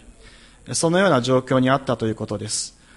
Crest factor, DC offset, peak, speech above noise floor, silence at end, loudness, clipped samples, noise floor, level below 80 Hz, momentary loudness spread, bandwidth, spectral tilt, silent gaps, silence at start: 18 dB; under 0.1%; -4 dBFS; 27 dB; 0.25 s; -21 LUFS; under 0.1%; -47 dBFS; -52 dBFS; 9 LU; 11.5 kHz; -4.5 dB/octave; none; 0.65 s